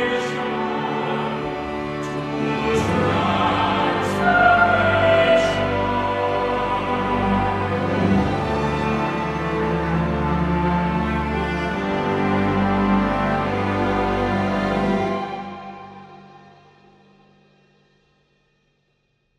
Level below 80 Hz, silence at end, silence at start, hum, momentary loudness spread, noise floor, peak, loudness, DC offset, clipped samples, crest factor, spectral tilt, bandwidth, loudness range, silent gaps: -38 dBFS; 3 s; 0 s; none; 9 LU; -67 dBFS; -4 dBFS; -20 LUFS; under 0.1%; under 0.1%; 18 dB; -6.5 dB/octave; 12.5 kHz; 7 LU; none